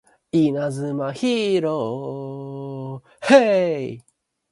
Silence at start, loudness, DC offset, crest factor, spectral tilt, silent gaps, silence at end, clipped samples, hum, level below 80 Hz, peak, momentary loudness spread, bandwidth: 0.35 s; -21 LUFS; under 0.1%; 20 dB; -6 dB/octave; none; 0.5 s; under 0.1%; none; -66 dBFS; -2 dBFS; 17 LU; 11.5 kHz